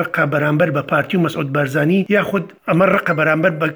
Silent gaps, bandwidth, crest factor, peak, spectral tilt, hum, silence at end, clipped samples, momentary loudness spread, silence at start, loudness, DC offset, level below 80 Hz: none; over 20 kHz; 16 dB; -2 dBFS; -7.5 dB/octave; none; 0 s; under 0.1%; 5 LU; 0 s; -16 LUFS; under 0.1%; -58 dBFS